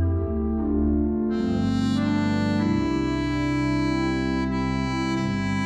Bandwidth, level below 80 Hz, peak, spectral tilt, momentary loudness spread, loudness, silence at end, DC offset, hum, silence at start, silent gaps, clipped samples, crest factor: 10 kHz; -34 dBFS; -12 dBFS; -7 dB/octave; 2 LU; -24 LUFS; 0 s; under 0.1%; none; 0 s; none; under 0.1%; 10 dB